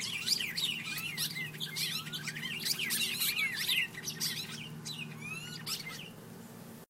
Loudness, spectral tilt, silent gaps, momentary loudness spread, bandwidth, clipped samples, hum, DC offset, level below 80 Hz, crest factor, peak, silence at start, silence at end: -34 LUFS; -1 dB/octave; none; 12 LU; 16 kHz; under 0.1%; none; under 0.1%; -74 dBFS; 20 dB; -18 dBFS; 0 s; 0.05 s